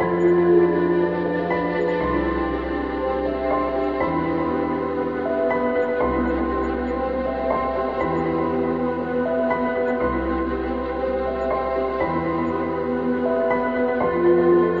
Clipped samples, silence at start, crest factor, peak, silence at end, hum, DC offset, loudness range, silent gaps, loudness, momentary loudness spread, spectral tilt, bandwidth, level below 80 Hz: under 0.1%; 0 s; 14 dB; -6 dBFS; 0 s; none; 0.2%; 2 LU; none; -22 LUFS; 6 LU; -9 dB/octave; 5.2 kHz; -40 dBFS